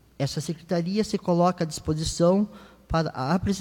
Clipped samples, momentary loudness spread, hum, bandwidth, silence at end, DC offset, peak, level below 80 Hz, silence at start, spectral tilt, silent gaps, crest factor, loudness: under 0.1%; 7 LU; none; 16.5 kHz; 0 s; under 0.1%; -10 dBFS; -44 dBFS; 0.2 s; -6 dB/octave; none; 16 dB; -26 LUFS